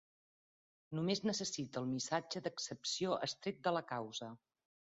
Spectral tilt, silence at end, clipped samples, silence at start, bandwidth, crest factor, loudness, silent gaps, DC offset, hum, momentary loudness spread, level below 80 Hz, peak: -4 dB/octave; 0.6 s; under 0.1%; 0.9 s; 8 kHz; 20 dB; -40 LUFS; none; under 0.1%; none; 7 LU; -80 dBFS; -20 dBFS